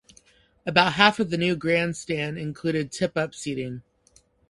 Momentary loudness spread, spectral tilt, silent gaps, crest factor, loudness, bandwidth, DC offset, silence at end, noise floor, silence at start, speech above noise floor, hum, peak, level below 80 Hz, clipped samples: 13 LU; -4.5 dB/octave; none; 26 dB; -24 LUFS; 11.5 kHz; under 0.1%; 0.7 s; -61 dBFS; 0.65 s; 37 dB; none; 0 dBFS; -58 dBFS; under 0.1%